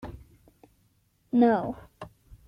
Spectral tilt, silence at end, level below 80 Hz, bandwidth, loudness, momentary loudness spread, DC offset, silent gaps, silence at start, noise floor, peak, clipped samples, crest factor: -8.5 dB/octave; 0.4 s; -56 dBFS; 5.2 kHz; -25 LUFS; 25 LU; under 0.1%; none; 0.05 s; -68 dBFS; -10 dBFS; under 0.1%; 20 dB